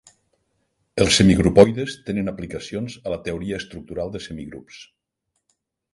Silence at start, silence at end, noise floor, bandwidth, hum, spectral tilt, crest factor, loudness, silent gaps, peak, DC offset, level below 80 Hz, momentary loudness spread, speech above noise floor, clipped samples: 0.95 s; 1.1 s; -77 dBFS; 11.5 kHz; none; -5 dB/octave; 22 dB; -20 LUFS; none; 0 dBFS; under 0.1%; -42 dBFS; 18 LU; 56 dB; under 0.1%